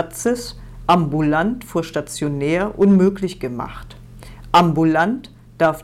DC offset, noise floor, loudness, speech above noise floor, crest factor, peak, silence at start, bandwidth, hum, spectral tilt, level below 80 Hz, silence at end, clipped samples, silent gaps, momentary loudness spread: under 0.1%; -38 dBFS; -18 LUFS; 20 dB; 12 dB; -6 dBFS; 0 s; 15 kHz; none; -6 dB/octave; -42 dBFS; 0 s; under 0.1%; none; 13 LU